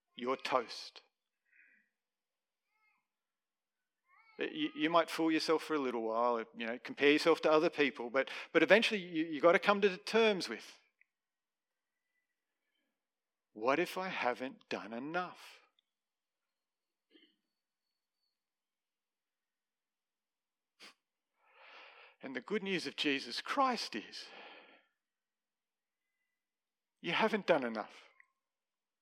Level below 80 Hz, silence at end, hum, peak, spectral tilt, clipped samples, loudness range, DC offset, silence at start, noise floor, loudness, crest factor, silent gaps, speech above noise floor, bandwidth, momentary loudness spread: under -90 dBFS; 1 s; none; -10 dBFS; -4 dB/octave; under 0.1%; 16 LU; under 0.1%; 0.2 s; under -90 dBFS; -34 LUFS; 28 dB; none; over 56 dB; 16 kHz; 17 LU